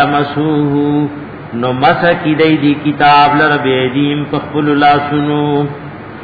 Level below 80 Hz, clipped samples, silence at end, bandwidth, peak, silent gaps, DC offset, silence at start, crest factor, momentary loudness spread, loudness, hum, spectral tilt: -46 dBFS; under 0.1%; 0 s; 5 kHz; 0 dBFS; none; 0.2%; 0 s; 12 dB; 10 LU; -12 LUFS; none; -9 dB/octave